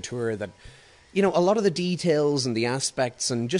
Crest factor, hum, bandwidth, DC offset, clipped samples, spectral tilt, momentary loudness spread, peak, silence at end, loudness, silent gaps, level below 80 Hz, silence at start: 16 dB; none; 11 kHz; under 0.1%; under 0.1%; -4.5 dB/octave; 9 LU; -10 dBFS; 0 s; -24 LUFS; none; -60 dBFS; 0.05 s